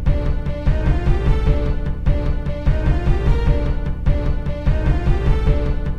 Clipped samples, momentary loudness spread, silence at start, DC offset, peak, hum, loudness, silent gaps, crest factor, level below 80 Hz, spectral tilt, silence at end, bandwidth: under 0.1%; 4 LU; 0 s; 2%; -4 dBFS; none; -21 LUFS; none; 12 dB; -18 dBFS; -8.5 dB/octave; 0 s; 6 kHz